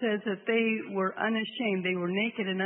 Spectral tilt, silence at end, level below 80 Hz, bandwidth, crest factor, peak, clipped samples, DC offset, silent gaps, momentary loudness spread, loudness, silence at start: -9.5 dB/octave; 0 s; -80 dBFS; 4 kHz; 14 dB; -16 dBFS; under 0.1%; under 0.1%; none; 3 LU; -29 LUFS; 0 s